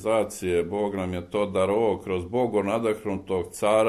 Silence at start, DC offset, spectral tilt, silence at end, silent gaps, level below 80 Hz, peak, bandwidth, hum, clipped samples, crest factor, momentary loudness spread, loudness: 0 s; under 0.1%; -5.5 dB/octave; 0 s; none; -56 dBFS; -10 dBFS; 13.5 kHz; none; under 0.1%; 16 dB; 6 LU; -26 LUFS